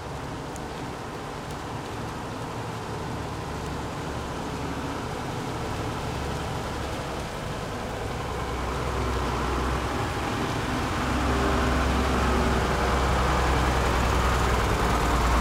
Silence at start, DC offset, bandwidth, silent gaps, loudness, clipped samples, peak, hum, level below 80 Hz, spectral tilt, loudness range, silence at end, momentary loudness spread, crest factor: 0 s; under 0.1%; 16 kHz; none; -28 LUFS; under 0.1%; -10 dBFS; none; -32 dBFS; -5 dB/octave; 9 LU; 0 s; 10 LU; 16 dB